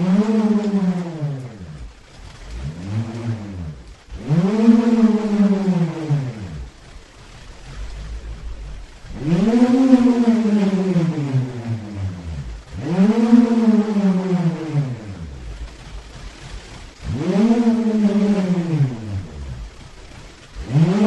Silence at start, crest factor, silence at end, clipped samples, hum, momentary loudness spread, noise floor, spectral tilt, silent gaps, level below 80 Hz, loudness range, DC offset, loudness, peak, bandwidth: 0 s; 20 dB; 0 s; under 0.1%; none; 23 LU; -41 dBFS; -8 dB/octave; none; -38 dBFS; 9 LU; under 0.1%; -18 LUFS; 0 dBFS; 9.2 kHz